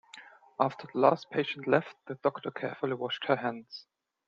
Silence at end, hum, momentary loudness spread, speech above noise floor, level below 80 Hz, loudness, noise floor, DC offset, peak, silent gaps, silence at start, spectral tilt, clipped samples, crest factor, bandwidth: 0.45 s; none; 21 LU; 23 dB; -78 dBFS; -31 LUFS; -53 dBFS; under 0.1%; -8 dBFS; none; 0.15 s; -6.5 dB/octave; under 0.1%; 24 dB; 7.6 kHz